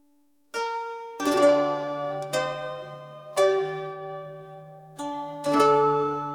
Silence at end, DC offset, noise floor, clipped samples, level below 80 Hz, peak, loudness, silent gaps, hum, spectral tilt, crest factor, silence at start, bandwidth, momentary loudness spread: 0 s; under 0.1%; -66 dBFS; under 0.1%; -72 dBFS; -8 dBFS; -25 LUFS; none; none; -4.5 dB/octave; 20 dB; 0.55 s; 17.5 kHz; 21 LU